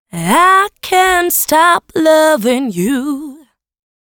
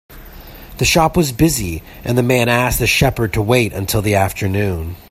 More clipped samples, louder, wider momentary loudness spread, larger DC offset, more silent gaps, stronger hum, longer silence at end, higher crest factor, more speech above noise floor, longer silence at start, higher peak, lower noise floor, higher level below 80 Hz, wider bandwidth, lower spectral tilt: neither; first, -11 LUFS vs -16 LUFS; about the same, 8 LU vs 8 LU; neither; neither; neither; first, 0.85 s vs 0.1 s; about the same, 12 dB vs 16 dB; first, 27 dB vs 20 dB; about the same, 0.15 s vs 0.1 s; about the same, 0 dBFS vs 0 dBFS; about the same, -39 dBFS vs -36 dBFS; second, -48 dBFS vs -32 dBFS; first, 19 kHz vs 16 kHz; about the same, -3.5 dB/octave vs -4.5 dB/octave